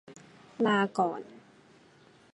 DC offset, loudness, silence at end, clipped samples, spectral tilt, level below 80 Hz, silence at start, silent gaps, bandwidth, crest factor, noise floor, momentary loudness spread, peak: under 0.1%; -29 LUFS; 0.95 s; under 0.1%; -6 dB/octave; -80 dBFS; 0.1 s; none; 11 kHz; 20 dB; -59 dBFS; 24 LU; -12 dBFS